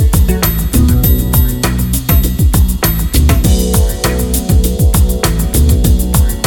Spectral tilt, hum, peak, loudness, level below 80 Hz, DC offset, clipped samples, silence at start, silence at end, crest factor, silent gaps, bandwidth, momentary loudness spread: -5.5 dB/octave; none; 0 dBFS; -12 LUFS; -12 dBFS; under 0.1%; under 0.1%; 0 s; 0 s; 10 dB; none; 17.5 kHz; 3 LU